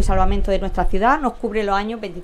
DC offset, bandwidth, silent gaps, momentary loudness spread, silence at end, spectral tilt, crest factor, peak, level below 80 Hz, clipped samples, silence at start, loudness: under 0.1%; 10 kHz; none; 5 LU; 0 s; -6 dB/octave; 14 dB; -4 dBFS; -22 dBFS; under 0.1%; 0 s; -20 LUFS